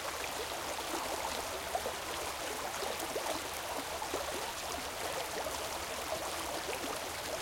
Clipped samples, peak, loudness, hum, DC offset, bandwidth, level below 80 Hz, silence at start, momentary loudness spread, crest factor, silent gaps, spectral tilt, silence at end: under 0.1%; -20 dBFS; -37 LUFS; none; under 0.1%; 17 kHz; -60 dBFS; 0 s; 2 LU; 18 dB; none; -1.5 dB/octave; 0 s